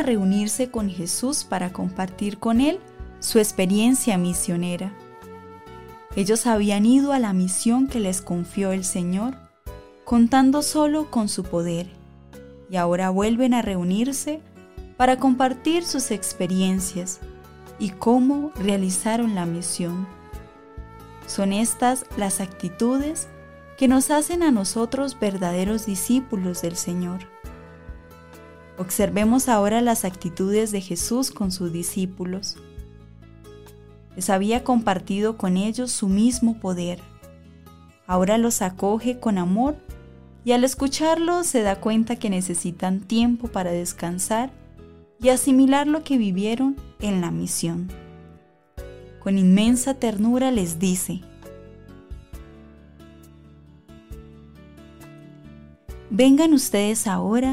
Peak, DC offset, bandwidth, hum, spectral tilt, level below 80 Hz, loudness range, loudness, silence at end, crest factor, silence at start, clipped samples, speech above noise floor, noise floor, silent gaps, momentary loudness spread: -6 dBFS; under 0.1%; 16 kHz; none; -5 dB/octave; -46 dBFS; 4 LU; -22 LUFS; 0 s; 16 dB; 0 s; under 0.1%; 30 dB; -51 dBFS; none; 23 LU